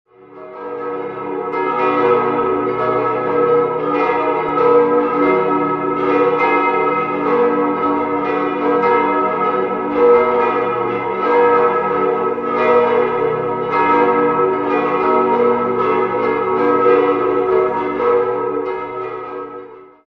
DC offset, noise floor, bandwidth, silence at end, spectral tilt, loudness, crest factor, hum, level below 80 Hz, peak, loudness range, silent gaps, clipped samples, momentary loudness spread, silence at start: under 0.1%; -36 dBFS; 5.4 kHz; 0.2 s; -8 dB/octave; -16 LUFS; 14 dB; none; -54 dBFS; 0 dBFS; 2 LU; none; under 0.1%; 10 LU; 0.3 s